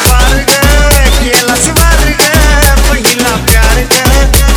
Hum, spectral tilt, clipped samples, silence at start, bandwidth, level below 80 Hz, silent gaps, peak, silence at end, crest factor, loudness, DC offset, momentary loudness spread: none; -3 dB/octave; 3%; 0 s; over 20 kHz; -10 dBFS; none; 0 dBFS; 0 s; 6 dB; -7 LUFS; under 0.1%; 2 LU